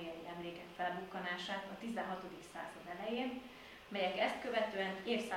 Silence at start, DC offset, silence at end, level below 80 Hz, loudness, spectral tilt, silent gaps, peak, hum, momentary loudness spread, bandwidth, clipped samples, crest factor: 0 s; under 0.1%; 0 s; -72 dBFS; -41 LUFS; -4.5 dB/octave; none; -22 dBFS; none; 12 LU; 16.5 kHz; under 0.1%; 20 dB